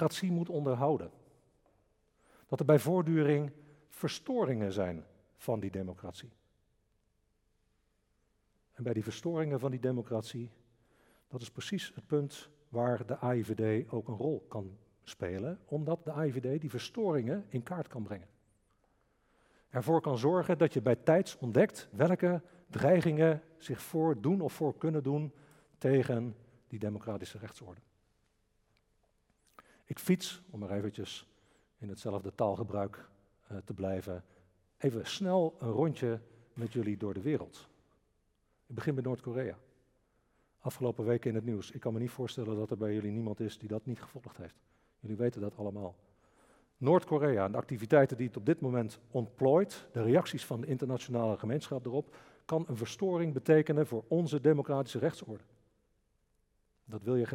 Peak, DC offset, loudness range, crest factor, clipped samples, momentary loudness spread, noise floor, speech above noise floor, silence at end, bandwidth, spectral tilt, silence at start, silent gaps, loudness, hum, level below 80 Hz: -10 dBFS; under 0.1%; 9 LU; 24 dB; under 0.1%; 16 LU; -76 dBFS; 43 dB; 0 s; 16.5 kHz; -7 dB/octave; 0 s; none; -34 LUFS; none; -74 dBFS